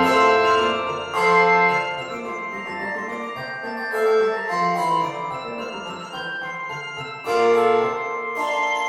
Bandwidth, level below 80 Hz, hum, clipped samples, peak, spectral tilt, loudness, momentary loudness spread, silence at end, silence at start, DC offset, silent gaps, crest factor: 14 kHz; -64 dBFS; none; under 0.1%; -6 dBFS; -4 dB/octave; -21 LUFS; 14 LU; 0 s; 0 s; under 0.1%; none; 16 dB